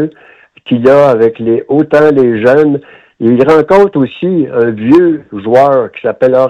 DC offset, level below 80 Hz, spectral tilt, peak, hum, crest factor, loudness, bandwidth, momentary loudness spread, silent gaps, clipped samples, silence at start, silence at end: under 0.1%; -48 dBFS; -8 dB/octave; 0 dBFS; none; 8 dB; -9 LUFS; 9.2 kHz; 8 LU; none; 1%; 0 s; 0 s